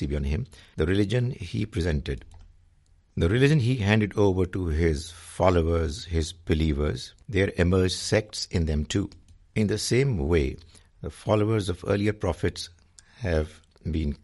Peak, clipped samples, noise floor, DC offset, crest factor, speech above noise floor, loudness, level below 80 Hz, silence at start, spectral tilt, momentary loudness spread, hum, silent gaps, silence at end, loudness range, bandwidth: -4 dBFS; under 0.1%; -60 dBFS; under 0.1%; 20 dB; 35 dB; -26 LUFS; -38 dBFS; 0 s; -6 dB/octave; 13 LU; none; none; 0.05 s; 4 LU; 11.5 kHz